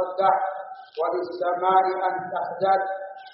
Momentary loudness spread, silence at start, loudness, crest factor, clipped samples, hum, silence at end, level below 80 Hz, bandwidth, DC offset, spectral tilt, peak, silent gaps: 11 LU; 0 s; -24 LUFS; 18 dB; under 0.1%; none; 0.05 s; -78 dBFS; 5.8 kHz; under 0.1%; -2.5 dB/octave; -6 dBFS; none